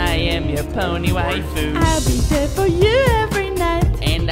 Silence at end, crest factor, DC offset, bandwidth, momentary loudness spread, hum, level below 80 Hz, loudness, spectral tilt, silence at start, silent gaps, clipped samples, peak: 0 s; 14 dB; under 0.1%; 16.5 kHz; 7 LU; none; -24 dBFS; -18 LUFS; -5 dB/octave; 0 s; none; under 0.1%; -2 dBFS